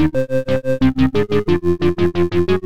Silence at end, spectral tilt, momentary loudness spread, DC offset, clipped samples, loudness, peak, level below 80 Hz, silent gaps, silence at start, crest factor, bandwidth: 0 s; -8 dB/octave; 4 LU; 5%; under 0.1%; -17 LUFS; -2 dBFS; -34 dBFS; none; 0 s; 12 dB; 10 kHz